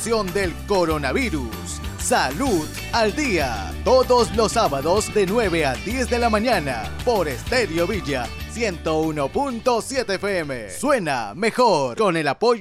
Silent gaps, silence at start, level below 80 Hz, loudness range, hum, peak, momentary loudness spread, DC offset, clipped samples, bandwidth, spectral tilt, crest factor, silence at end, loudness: none; 0 s; -36 dBFS; 3 LU; none; -6 dBFS; 7 LU; under 0.1%; under 0.1%; 16 kHz; -4.5 dB/octave; 14 dB; 0 s; -21 LUFS